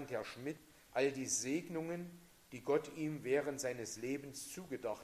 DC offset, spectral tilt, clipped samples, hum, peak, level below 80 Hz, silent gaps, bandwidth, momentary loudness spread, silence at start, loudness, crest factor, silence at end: under 0.1%; -4 dB/octave; under 0.1%; none; -24 dBFS; -74 dBFS; none; 15.5 kHz; 10 LU; 0 s; -40 LUFS; 18 dB; 0 s